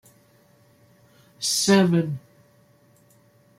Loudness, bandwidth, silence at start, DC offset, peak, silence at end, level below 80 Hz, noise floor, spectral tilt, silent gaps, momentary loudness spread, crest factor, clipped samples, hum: -21 LUFS; 16 kHz; 1.4 s; under 0.1%; -6 dBFS; 1.4 s; -66 dBFS; -58 dBFS; -4.5 dB/octave; none; 13 LU; 22 dB; under 0.1%; none